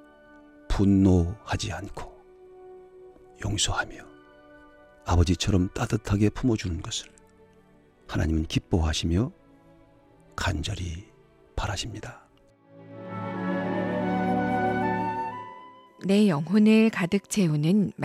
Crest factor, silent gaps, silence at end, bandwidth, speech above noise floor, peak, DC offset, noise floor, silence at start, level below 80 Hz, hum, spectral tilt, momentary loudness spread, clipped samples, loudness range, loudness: 18 dB; none; 0 s; 13.5 kHz; 34 dB; -10 dBFS; under 0.1%; -58 dBFS; 0.7 s; -42 dBFS; none; -5.5 dB/octave; 19 LU; under 0.1%; 10 LU; -26 LUFS